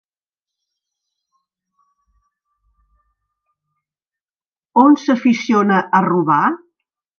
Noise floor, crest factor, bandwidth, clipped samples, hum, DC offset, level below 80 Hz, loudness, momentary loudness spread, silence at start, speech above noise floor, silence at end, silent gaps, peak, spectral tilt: under -90 dBFS; 18 dB; 6.8 kHz; under 0.1%; none; under 0.1%; -68 dBFS; -15 LUFS; 7 LU; 4.75 s; over 76 dB; 0.65 s; none; 0 dBFS; -6.5 dB/octave